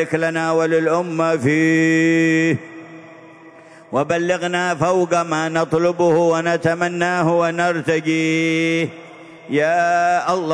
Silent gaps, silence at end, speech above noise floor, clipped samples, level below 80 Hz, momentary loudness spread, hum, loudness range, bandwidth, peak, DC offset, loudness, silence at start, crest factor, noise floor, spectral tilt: none; 0 s; 25 dB; under 0.1%; -62 dBFS; 5 LU; none; 3 LU; 10.5 kHz; -2 dBFS; under 0.1%; -18 LUFS; 0 s; 16 dB; -43 dBFS; -5.5 dB/octave